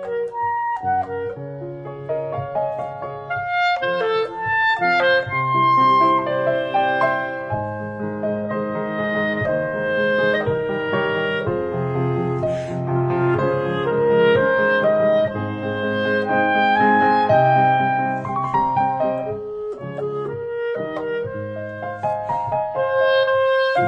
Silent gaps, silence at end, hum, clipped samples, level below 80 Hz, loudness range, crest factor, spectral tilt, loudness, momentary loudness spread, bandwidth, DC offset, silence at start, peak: none; 0 s; none; under 0.1%; -54 dBFS; 7 LU; 16 dB; -7.5 dB/octave; -20 LUFS; 12 LU; 8.2 kHz; under 0.1%; 0 s; -4 dBFS